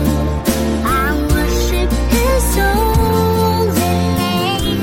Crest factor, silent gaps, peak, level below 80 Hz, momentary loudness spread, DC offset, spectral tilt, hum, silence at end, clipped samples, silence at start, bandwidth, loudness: 14 dB; none; -2 dBFS; -20 dBFS; 3 LU; under 0.1%; -5 dB/octave; none; 0 s; under 0.1%; 0 s; 16.5 kHz; -15 LUFS